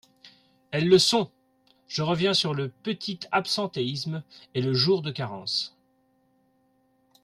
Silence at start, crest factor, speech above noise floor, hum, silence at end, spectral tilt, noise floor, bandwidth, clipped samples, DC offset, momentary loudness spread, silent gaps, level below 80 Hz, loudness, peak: 0.25 s; 20 dB; 41 dB; none; 1.55 s; -4.5 dB/octave; -67 dBFS; 14 kHz; under 0.1%; under 0.1%; 14 LU; none; -66 dBFS; -26 LUFS; -8 dBFS